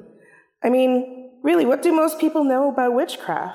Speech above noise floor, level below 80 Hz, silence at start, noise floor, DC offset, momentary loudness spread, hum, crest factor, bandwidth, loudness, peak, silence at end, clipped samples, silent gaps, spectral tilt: 34 dB; -76 dBFS; 0.6 s; -53 dBFS; under 0.1%; 8 LU; none; 12 dB; 16.5 kHz; -20 LUFS; -8 dBFS; 0 s; under 0.1%; none; -4.5 dB/octave